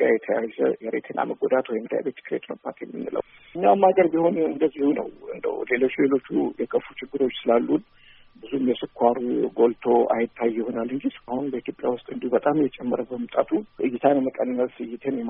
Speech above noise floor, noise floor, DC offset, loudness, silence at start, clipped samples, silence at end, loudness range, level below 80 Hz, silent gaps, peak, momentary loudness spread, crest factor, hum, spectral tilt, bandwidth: 23 dB; -47 dBFS; under 0.1%; -24 LUFS; 0 s; under 0.1%; 0 s; 4 LU; -64 dBFS; none; -4 dBFS; 10 LU; 20 dB; none; -5 dB/octave; 3.8 kHz